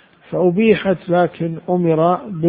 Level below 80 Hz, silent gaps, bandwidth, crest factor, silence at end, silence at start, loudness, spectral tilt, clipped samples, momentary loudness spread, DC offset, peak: -52 dBFS; none; 4.9 kHz; 16 dB; 0 s; 0.3 s; -17 LUFS; -12.5 dB/octave; under 0.1%; 6 LU; under 0.1%; 0 dBFS